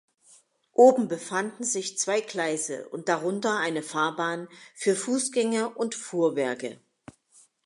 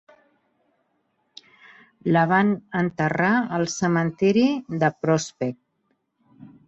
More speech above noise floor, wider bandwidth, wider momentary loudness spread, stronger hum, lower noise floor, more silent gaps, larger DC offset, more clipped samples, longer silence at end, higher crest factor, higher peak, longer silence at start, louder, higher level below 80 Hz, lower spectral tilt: second, 34 dB vs 50 dB; first, 11.5 kHz vs 8.2 kHz; first, 12 LU vs 8 LU; neither; second, -60 dBFS vs -72 dBFS; neither; neither; neither; first, 0.9 s vs 0.2 s; about the same, 20 dB vs 18 dB; about the same, -6 dBFS vs -6 dBFS; second, 0.8 s vs 2.05 s; second, -26 LUFS vs -22 LUFS; second, -80 dBFS vs -64 dBFS; second, -3.5 dB/octave vs -6 dB/octave